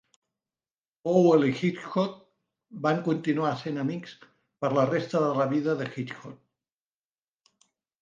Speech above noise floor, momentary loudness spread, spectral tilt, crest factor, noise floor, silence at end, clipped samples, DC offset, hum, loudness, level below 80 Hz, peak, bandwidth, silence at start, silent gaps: over 64 dB; 16 LU; -7.5 dB/octave; 18 dB; under -90 dBFS; 1.65 s; under 0.1%; under 0.1%; none; -27 LUFS; -76 dBFS; -10 dBFS; 7.6 kHz; 1.05 s; none